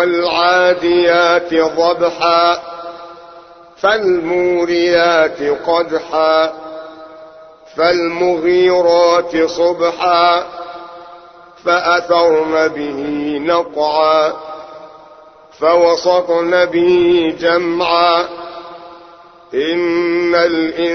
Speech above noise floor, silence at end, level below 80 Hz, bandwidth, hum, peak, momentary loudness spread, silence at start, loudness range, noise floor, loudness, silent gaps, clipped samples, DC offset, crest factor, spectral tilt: 28 dB; 0 s; -52 dBFS; 6.4 kHz; none; 0 dBFS; 18 LU; 0 s; 3 LU; -41 dBFS; -13 LUFS; none; under 0.1%; under 0.1%; 14 dB; -4.5 dB/octave